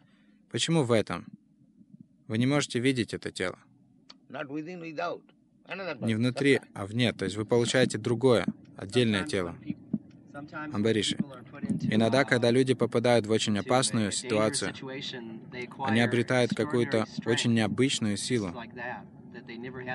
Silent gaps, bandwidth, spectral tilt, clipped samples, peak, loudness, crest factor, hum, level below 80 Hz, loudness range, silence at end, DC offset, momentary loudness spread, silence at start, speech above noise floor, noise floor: none; 11.5 kHz; -5 dB/octave; under 0.1%; -8 dBFS; -28 LUFS; 20 dB; none; -66 dBFS; 6 LU; 0 s; under 0.1%; 15 LU; 0.55 s; 34 dB; -61 dBFS